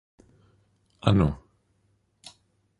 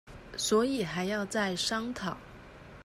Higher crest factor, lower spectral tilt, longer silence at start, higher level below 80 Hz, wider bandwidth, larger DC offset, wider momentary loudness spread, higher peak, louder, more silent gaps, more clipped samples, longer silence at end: first, 26 dB vs 16 dB; first, -8 dB/octave vs -3.5 dB/octave; first, 1.05 s vs 0.05 s; first, -44 dBFS vs -58 dBFS; second, 11.5 kHz vs 16 kHz; neither; first, 26 LU vs 21 LU; first, -4 dBFS vs -16 dBFS; first, -25 LUFS vs -31 LUFS; neither; neither; first, 1.45 s vs 0 s